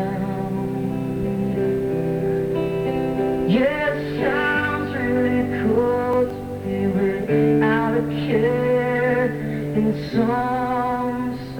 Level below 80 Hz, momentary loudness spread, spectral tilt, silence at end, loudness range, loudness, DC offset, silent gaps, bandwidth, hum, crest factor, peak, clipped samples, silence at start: -44 dBFS; 6 LU; -8 dB/octave; 0 s; 2 LU; -21 LUFS; under 0.1%; none; 18.5 kHz; none; 14 dB; -6 dBFS; under 0.1%; 0 s